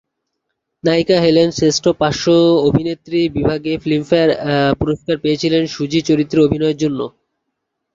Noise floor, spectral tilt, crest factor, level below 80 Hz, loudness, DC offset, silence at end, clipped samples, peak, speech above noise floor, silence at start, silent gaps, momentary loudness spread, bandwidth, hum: -75 dBFS; -5.5 dB/octave; 14 dB; -42 dBFS; -15 LUFS; under 0.1%; 0.85 s; under 0.1%; -2 dBFS; 60 dB; 0.85 s; none; 7 LU; 7.6 kHz; none